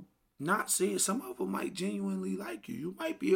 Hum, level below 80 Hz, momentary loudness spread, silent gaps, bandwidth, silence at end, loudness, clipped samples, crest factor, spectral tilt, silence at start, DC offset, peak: none; -74 dBFS; 11 LU; none; 17 kHz; 0 s; -34 LUFS; under 0.1%; 18 dB; -4 dB/octave; 0 s; under 0.1%; -16 dBFS